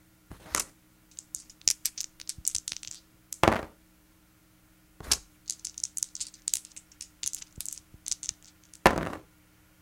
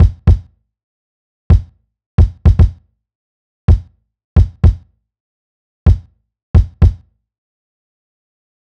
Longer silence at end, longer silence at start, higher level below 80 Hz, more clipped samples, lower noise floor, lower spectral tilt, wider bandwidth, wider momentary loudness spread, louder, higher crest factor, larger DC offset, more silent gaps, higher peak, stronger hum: second, 0.6 s vs 1.75 s; first, 0.3 s vs 0 s; second, -52 dBFS vs -18 dBFS; neither; first, -62 dBFS vs -29 dBFS; second, -2 dB/octave vs -10 dB/octave; first, 17 kHz vs 5.4 kHz; first, 20 LU vs 8 LU; second, -31 LUFS vs -14 LUFS; first, 34 dB vs 14 dB; neither; second, none vs 0.83-1.50 s, 2.06-2.18 s, 3.15-3.68 s, 4.24-4.36 s, 5.20-5.86 s, 6.43-6.54 s; about the same, 0 dBFS vs 0 dBFS; neither